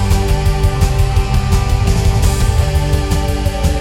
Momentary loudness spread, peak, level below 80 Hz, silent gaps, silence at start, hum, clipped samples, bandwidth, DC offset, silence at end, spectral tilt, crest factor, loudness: 2 LU; -2 dBFS; -16 dBFS; none; 0 s; none; under 0.1%; 16.5 kHz; under 0.1%; 0 s; -5.5 dB/octave; 12 dB; -15 LUFS